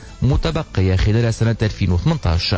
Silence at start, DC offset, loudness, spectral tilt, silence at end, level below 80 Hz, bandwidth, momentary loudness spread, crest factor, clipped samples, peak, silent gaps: 0 s; under 0.1%; -18 LUFS; -6.5 dB/octave; 0 s; -24 dBFS; 8 kHz; 3 LU; 10 dB; under 0.1%; -6 dBFS; none